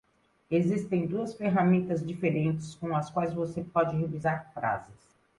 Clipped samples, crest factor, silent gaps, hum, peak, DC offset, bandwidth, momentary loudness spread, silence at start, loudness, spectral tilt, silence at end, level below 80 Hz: under 0.1%; 16 dB; none; none; -14 dBFS; under 0.1%; 11.5 kHz; 7 LU; 0.5 s; -30 LUFS; -8 dB/octave; 0.45 s; -62 dBFS